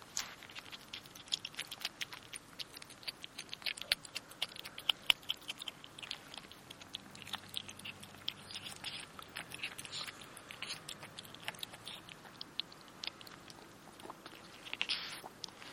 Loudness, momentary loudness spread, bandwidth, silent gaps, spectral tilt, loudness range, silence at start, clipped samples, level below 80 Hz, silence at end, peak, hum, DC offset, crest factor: -42 LUFS; 15 LU; 16.5 kHz; none; -0.5 dB/octave; 8 LU; 0 s; under 0.1%; -74 dBFS; 0 s; -6 dBFS; none; under 0.1%; 40 dB